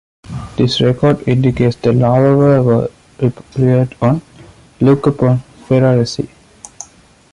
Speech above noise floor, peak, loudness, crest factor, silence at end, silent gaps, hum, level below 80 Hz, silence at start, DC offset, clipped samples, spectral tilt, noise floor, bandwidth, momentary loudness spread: 33 dB; 0 dBFS; -14 LUFS; 12 dB; 0.5 s; none; none; -42 dBFS; 0.3 s; under 0.1%; under 0.1%; -7.5 dB/octave; -45 dBFS; 10.5 kHz; 16 LU